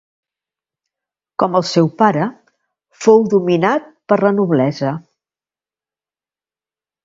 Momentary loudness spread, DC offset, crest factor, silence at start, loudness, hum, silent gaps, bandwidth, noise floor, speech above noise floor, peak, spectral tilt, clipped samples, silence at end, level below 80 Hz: 10 LU; under 0.1%; 18 dB; 1.4 s; -15 LUFS; none; none; 7.8 kHz; under -90 dBFS; over 76 dB; 0 dBFS; -6.5 dB/octave; under 0.1%; 2.05 s; -62 dBFS